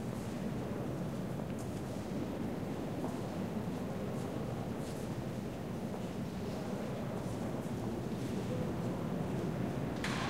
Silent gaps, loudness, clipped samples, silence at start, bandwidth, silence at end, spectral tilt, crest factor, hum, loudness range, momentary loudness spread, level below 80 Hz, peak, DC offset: none; -39 LUFS; under 0.1%; 0 s; 16 kHz; 0 s; -6.5 dB/octave; 16 dB; none; 2 LU; 3 LU; -56 dBFS; -22 dBFS; 0.1%